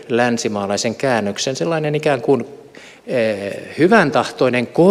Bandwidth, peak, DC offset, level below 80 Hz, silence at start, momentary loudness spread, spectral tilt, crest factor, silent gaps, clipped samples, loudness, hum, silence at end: 14.5 kHz; -2 dBFS; under 0.1%; -62 dBFS; 0 s; 9 LU; -5 dB/octave; 16 dB; none; under 0.1%; -17 LUFS; none; 0 s